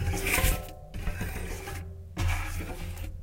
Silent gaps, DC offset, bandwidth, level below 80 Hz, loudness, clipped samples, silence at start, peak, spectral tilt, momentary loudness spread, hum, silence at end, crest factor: none; under 0.1%; 16.5 kHz; -34 dBFS; -32 LUFS; under 0.1%; 0 s; -12 dBFS; -4 dB/octave; 14 LU; none; 0 s; 20 dB